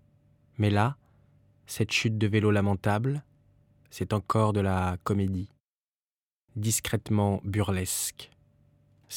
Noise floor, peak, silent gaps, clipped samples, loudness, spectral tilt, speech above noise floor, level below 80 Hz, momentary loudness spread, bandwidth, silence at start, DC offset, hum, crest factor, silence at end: under -90 dBFS; -8 dBFS; 5.60-6.48 s; under 0.1%; -28 LUFS; -5 dB/octave; over 63 dB; -56 dBFS; 14 LU; 17 kHz; 0.6 s; under 0.1%; none; 22 dB; 0 s